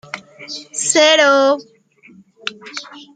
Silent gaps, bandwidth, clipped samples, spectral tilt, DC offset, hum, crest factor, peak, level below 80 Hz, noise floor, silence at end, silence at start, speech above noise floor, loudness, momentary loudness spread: none; 9.4 kHz; under 0.1%; -0.5 dB/octave; under 0.1%; none; 16 dB; 0 dBFS; -70 dBFS; -47 dBFS; 0.15 s; 0.15 s; 31 dB; -13 LUFS; 20 LU